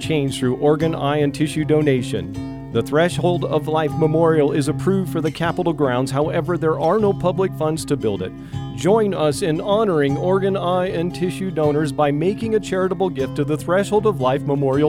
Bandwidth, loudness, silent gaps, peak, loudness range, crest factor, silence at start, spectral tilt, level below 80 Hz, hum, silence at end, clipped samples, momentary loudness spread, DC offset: 16 kHz; -19 LUFS; none; -4 dBFS; 1 LU; 14 dB; 0 s; -6.5 dB/octave; -46 dBFS; none; 0 s; under 0.1%; 6 LU; under 0.1%